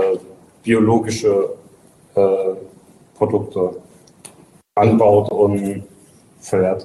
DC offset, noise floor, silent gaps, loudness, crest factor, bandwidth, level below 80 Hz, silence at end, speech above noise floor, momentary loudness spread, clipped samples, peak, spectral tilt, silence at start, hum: under 0.1%; -49 dBFS; none; -18 LUFS; 14 dB; 12.5 kHz; -54 dBFS; 0 s; 33 dB; 16 LU; under 0.1%; -4 dBFS; -7 dB/octave; 0 s; none